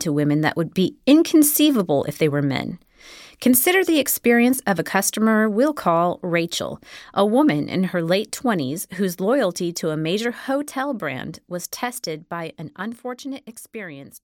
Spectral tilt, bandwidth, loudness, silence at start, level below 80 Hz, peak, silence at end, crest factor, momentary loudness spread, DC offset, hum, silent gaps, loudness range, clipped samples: -4.5 dB/octave; 17.5 kHz; -20 LUFS; 0 s; -62 dBFS; -2 dBFS; 0.05 s; 18 dB; 16 LU; under 0.1%; none; none; 9 LU; under 0.1%